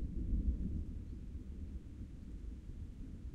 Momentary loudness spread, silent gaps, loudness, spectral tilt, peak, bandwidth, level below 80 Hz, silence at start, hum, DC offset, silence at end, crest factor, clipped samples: 11 LU; none; -46 LUFS; -9.5 dB/octave; -26 dBFS; 7 kHz; -44 dBFS; 0 s; none; under 0.1%; 0 s; 16 dB; under 0.1%